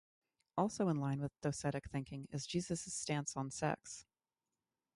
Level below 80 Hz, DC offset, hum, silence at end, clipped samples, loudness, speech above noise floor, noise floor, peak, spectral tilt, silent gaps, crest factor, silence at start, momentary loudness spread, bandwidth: -68 dBFS; under 0.1%; none; 0.95 s; under 0.1%; -40 LUFS; over 50 dB; under -90 dBFS; -22 dBFS; -5 dB/octave; none; 20 dB; 0.55 s; 9 LU; 11.5 kHz